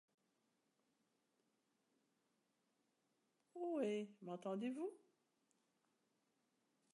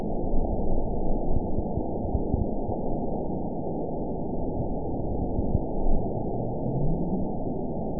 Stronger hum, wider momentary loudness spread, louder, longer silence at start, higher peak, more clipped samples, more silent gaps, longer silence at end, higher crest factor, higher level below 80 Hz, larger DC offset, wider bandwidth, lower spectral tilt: neither; first, 9 LU vs 3 LU; second, -47 LUFS vs -30 LUFS; first, 3.55 s vs 0 s; second, -30 dBFS vs -10 dBFS; neither; neither; first, 1.95 s vs 0 s; first, 22 dB vs 16 dB; second, under -90 dBFS vs -30 dBFS; second, under 0.1% vs 2%; first, 11 kHz vs 1 kHz; second, -6.5 dB/octave vs -18.5 dB/octave